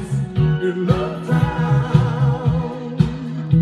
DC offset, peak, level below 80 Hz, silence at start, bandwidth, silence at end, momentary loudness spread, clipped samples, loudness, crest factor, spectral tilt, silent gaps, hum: under 0.1%; -2 dBFS; -36 dBFS; 0 s; 10 kHz; 0 s; 6 LU; under 0.1%; -19 LUFS; 16 dB; -8.5 dB/octave; none; none